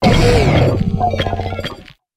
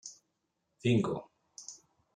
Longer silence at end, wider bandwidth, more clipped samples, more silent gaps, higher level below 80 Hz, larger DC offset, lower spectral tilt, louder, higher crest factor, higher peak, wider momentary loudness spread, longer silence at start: about the same, 0.35 s vs 0.4 s; first, 15.5 kHz vs 9.8 kHz; neither; neither; first, -24 dBFS vs -70 dBFS; neither; about the same, -6.5 dB/octave vs -6 dB/octave; first, -15 LUFS vs -32 LUFS; second, 14 dB vs 20 dB; first, 0 dBFS vs -16 dBFS; second, 13 LU vs 22 LU; about the same, 0 s vs 0.05 s